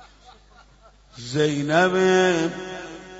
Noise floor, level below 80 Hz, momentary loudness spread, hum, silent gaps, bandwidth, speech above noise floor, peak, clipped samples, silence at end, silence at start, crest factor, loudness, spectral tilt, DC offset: -53 dBFS; -56 dBFS; 17 LU; 50 Hz at -45 dBFS; none; 8 kHz; 32 dB; -6 dBFS; under 0.1%; 0 s; 1.15 s; 18 dB; -20 LUFS; -5 dB/octave; under 0.1%